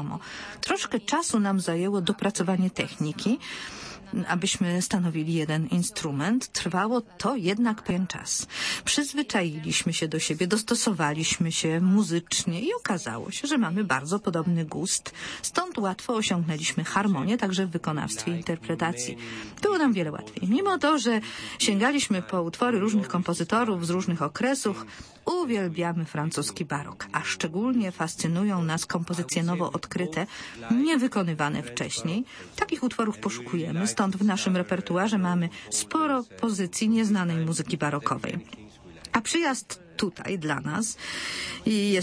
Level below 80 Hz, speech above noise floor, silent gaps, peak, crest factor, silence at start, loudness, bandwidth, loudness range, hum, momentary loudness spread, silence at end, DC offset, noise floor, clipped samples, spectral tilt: -60 dBFS; 19 dB; none; -10 dBFS; 18 dB; 0 s; -27 LUFS; 11 kHz; 3 LU; none; 8 LU; 0 s; under 0.1%; -46 dBFS; under 0.1%; -4.5 dB/octave